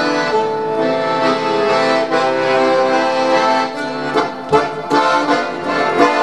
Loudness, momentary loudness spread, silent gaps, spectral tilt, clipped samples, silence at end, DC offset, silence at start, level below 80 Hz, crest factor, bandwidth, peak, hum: -15 LUFS; 5 LU; none; -4.5 dB/octave; under 0.1%; 0 s; 0.6%; 0 s; -54 dBFS; 16 dB; 11.5 kHz; 0 dBFS; none